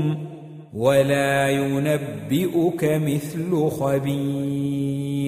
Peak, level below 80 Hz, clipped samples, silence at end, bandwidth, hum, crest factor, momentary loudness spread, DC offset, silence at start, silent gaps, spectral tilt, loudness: -6 dBFS; -56 dBFS; under 0.1%; 0 s; 15.5 kHz; none; 16 dB; 7 LU; under 0.1%; 0 s; none; -6.5 dB/octave; -22 LUFS